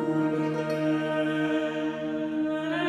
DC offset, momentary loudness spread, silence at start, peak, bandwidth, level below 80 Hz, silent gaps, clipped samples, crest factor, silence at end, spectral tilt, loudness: under 0.1%; 4 LU; 0 s; -16 dBFS; 10 kHz; -66 dBFS; none; under 0.1%; 12 dB; 0 s; -7 dB/octave; -28 LUFS